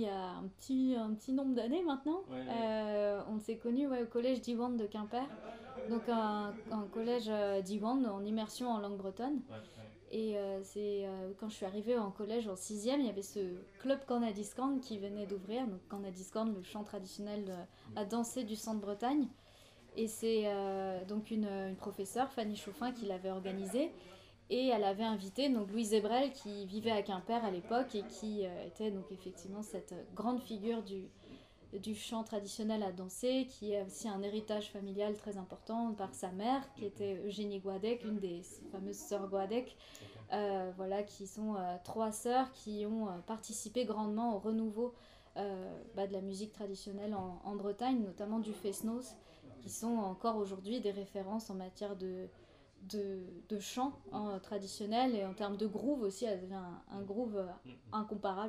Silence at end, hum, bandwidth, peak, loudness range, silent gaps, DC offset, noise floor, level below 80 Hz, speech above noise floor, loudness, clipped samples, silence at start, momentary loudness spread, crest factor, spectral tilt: 0 s; none; 15.5 kHz; -22 dBFS; 5 LU; none; under 0.1%; -62 dBFS; -70 dBFS; 23 dB; -39 LUFS; under 0.1%; 0 s; 11 LU; 18 dB; -5 dB/octave